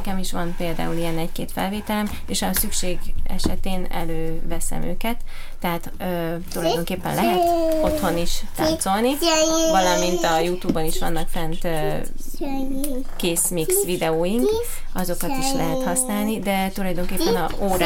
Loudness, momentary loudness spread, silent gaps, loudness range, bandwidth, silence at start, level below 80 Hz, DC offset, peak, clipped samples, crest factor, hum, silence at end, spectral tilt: -23 LUFS; 9 LU; none; 7 LU; 17 kHz; 0 s; -26 dBFS; under 0.1%; -4 dBFS; under 0.1%; 16 dB; none; 0 s; -4 dB/octave